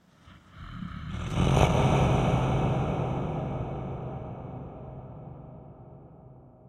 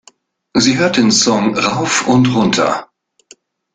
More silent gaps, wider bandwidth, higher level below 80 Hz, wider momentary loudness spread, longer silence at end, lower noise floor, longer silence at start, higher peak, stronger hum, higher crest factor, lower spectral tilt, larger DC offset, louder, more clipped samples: neither; first, 12 kHz vs 9.6 kHz; first, -40 dBFS vs -50 dBFS; first, 23 LU vs 6 LU; second, 0.2 s vs 0.9 s; first, -55 dBFS vs -49 dBFS; second, 0.25 s vs 0.55 s; second, -6 dBFS vs 0 dBFS; neither; first, 24 dB vs 14 dB; first, -7 dB/octave vs -4 dB/octave; neither; second, -28 LUFS vs -13 LUFS; neither